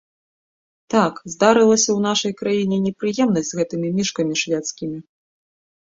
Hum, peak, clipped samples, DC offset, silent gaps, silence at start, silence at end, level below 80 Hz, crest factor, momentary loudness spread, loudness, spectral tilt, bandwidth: none; -2 dBFS; under 0.1%; under 0.1%; none; 0.9 s; 0.95 s; -60 dBFS; 18 dB; 9 LU; -19 LUFS; -4 dB/octave; 8 kHz